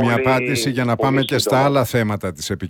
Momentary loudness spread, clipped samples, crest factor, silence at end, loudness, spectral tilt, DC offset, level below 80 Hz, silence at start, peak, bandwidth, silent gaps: 6 LU; under 0.1%; 14 dB; 0 s; -18 LUFS; -5 dB/octave; under 0.1%; -48 dBFS; 0 s; -4 dBFS; 18.5 kHz; none